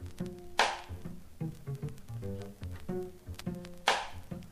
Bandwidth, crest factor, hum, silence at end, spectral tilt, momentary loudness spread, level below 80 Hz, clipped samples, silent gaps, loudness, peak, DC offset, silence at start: 15.5 kHz; 26 dB; none; 0 s; -4 dB/octave; 14 LU; -54 dBFS; under 0.1%; none; -37 LUFS; -10 dBFS; under 0.1%; 0 s